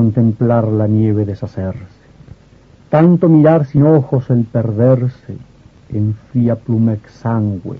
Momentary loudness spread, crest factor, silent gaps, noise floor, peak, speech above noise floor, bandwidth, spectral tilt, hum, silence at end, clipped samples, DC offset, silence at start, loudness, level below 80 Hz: 14 LU; 14 dB; none; -45 dBFS; 0 dBFS; 32 dB; 5.2 kHz; -11.5 dB/octave; none; 0 s; under 0.1%; under 0.1%; 0 s; -14 LUFS; -46 dBFS